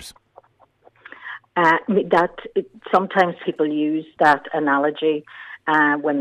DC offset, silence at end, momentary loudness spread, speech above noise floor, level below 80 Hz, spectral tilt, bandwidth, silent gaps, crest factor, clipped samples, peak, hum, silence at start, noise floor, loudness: under 0.1%; 0 s; 12 LU; 36 dB; -62 dBFS; -6 dB/octave; 13.5 kHz; none; 16 dB; under 0.1%; -4 dBFS; none; 0 s; -55 dBFS; -20 LUFS